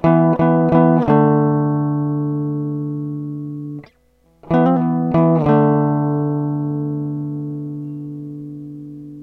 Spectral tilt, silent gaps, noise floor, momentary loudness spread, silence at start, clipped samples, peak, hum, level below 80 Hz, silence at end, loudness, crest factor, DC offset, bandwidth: -11.5 dB/octave; none; -57 dBFS; 17 LU; 0 s; under 0.1%; 0 dBFS; none; -50 dBFS; 0 s; -17 LUFS; 18 dB; under 0.1%; 4.2 kHz